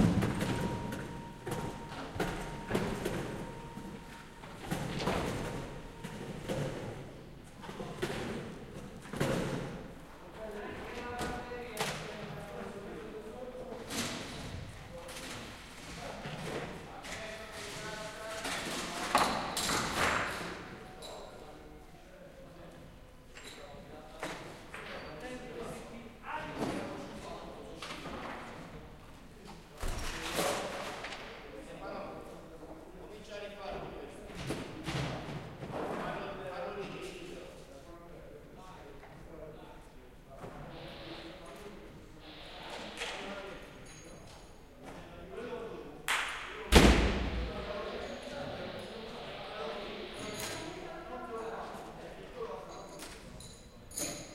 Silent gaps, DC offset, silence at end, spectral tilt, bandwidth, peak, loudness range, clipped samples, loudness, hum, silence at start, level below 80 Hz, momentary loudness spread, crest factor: none; under 0.1%; 0 s; -4.5 dB/octave; 16 kHz; -4 dBFS; 16 LU; under 0.1%; -38 LUFS; none; 0 s; -46 dBFS; 17 LU; 34 dB